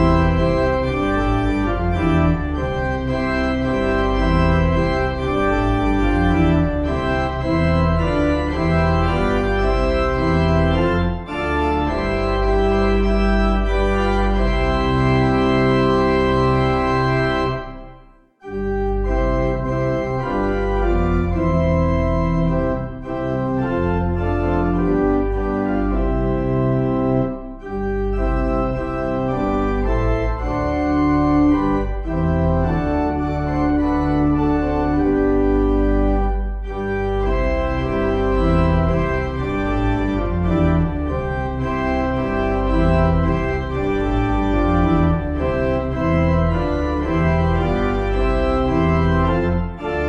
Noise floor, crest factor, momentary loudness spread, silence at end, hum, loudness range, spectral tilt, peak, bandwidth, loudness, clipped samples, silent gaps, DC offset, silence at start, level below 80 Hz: -47 dBFS; 14 dB; 5 LU; 0 s; none; 3 LU; -8.5 dB/octave; -4 dBFS; 8.4 kHz; -19 LUFS; under 0.1%; none; under 0.1%; 0 s; -24 dBFS